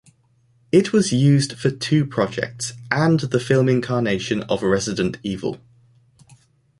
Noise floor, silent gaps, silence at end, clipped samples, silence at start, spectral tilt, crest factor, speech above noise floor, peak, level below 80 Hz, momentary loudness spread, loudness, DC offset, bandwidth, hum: -60 dBFS; none; 1.25 s; under 0.1%; 0.75 s; -6 dB/octave; 20 dB; 41 dB; -2 dBFS; -52 dBFS; 10 LU; -20 LUFS; under 0.1%; 11.5 kHz; none